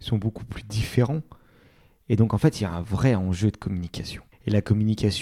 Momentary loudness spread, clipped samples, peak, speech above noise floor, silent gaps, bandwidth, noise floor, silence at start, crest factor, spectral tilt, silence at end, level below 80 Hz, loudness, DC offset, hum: 11 LU; under 0.1%; -4 dBFS; 33 dB; none; 14.5 kHz; -57 dBFS; 0 s; 20 dB; -7 dB/octave; 0 s; -44 dBFS; -25 LUFS; under 0.1%; none